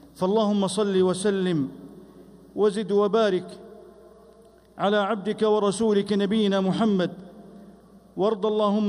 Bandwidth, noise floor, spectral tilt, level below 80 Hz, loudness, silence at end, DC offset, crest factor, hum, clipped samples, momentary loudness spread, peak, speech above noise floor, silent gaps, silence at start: 11.5 kHz; -53 dBFS; -6 dB/octave; -64 dBFS; -24 LUFS; 0 s; under 0.1%; 14 dB; none; under 0.1%; 10 LU; -10 dBFS; 30 dB; none; 0.15 s